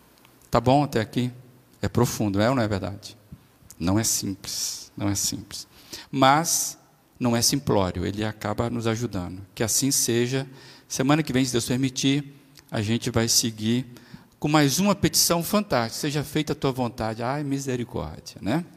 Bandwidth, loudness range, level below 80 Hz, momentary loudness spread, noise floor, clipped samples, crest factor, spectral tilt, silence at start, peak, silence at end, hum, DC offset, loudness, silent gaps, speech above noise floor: 15.5 kHz; 4 LU; -52 dBFS; 13 LU; -55 dBFS; under 0.1%; 22 dB; -4 dB/octave; 0.5 s; -4 dBFS; 0.1 s; none; under 0.1%; -24 LUFS; none; 31 dB